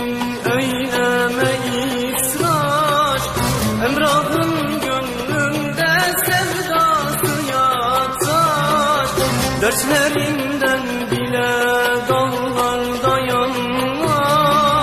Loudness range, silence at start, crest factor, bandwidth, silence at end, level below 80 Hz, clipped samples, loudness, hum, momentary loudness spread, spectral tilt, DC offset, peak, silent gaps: 1 LU; 0 s; 16 dB; 15 kHz; 0 s; -40 dBFS; under 0.1%; -17 LUFS; none; 4 LU; -4 dB/octave; under 0.1%; -2 dBFS; none